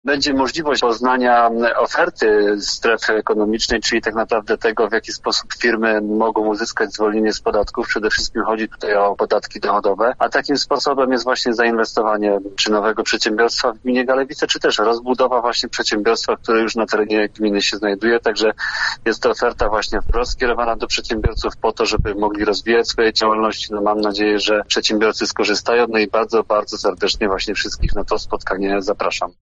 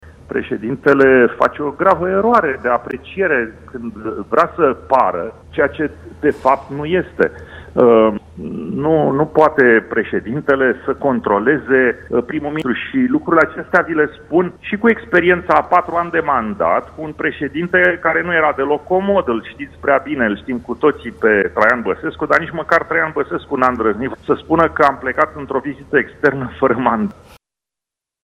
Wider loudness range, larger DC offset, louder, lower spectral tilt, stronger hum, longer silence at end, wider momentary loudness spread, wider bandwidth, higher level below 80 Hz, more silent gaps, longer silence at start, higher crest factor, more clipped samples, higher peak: about the same, 2 LU vs 3 LU; neither; about the same, -18 LUFS vs -16 LUFS; second, -3.5 dB/octave vs -7.5 dB/octave; neither; second, 0.15 s vs 1.1 s; second, 5 LU vs 10 LU; second, 8 kHz vs 9.4 kHz; first, -34 dBFS vs -48 dBFS; neither; about the same, 0.05 s vs 0.05 s; about the same, 16 dB vs 16 dB; neither; about the same, -2 dBFS vs 0 dBFS